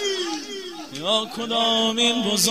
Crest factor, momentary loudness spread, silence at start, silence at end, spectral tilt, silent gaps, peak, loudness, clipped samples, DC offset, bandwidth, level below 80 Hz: 20 dB; 14 LU; 0 s; 0 s; -2 dB/octave; none; -4 dBFS; -21 LUFS; under 0.1%; 0.2%; 15.5 kHz; -64 dBFS